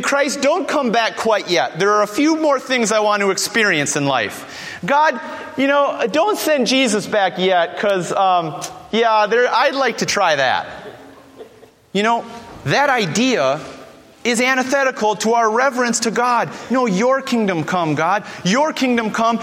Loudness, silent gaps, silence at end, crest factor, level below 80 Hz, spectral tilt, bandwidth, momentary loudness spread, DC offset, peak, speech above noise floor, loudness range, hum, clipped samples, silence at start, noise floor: -17 LUFS; none; 0 s; 16 dB; -60 dBFS; -3.5 dB/octave; 16.5 kHz; 7 LU; under 0.1%; -2 dBFS; 29 dB; 3 LU; none; under 0.1%; 0 s; -45 dBFS